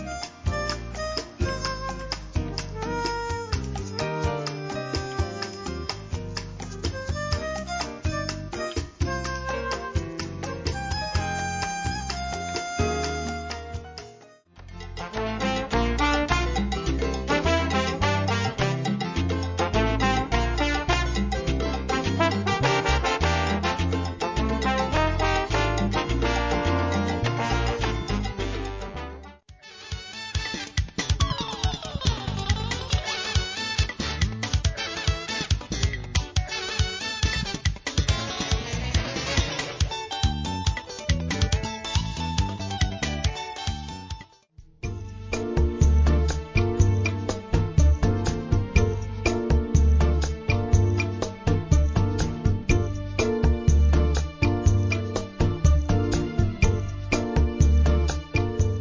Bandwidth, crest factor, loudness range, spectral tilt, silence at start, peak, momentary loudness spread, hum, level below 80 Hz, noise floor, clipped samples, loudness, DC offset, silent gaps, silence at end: 7.8 kHz; 18 dB; 7 LU; -5 dB/octave; 0 s; -6 dBFS; 10 LU; none; -28 dBFS; -51 dBFS; under 0.1%; -26 LUFS; under 0.1%; none; 0 s